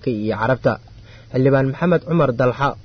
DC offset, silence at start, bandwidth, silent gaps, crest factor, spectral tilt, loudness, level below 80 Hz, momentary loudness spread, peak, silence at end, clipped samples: under 0.1%; 0.05 s; 6.4 kHz; none; 14 dB; -9 dB/octave; -18 LUFS; -46 dBFS; 6 LU; -4 dBFS; 0.05 s; under 0.1%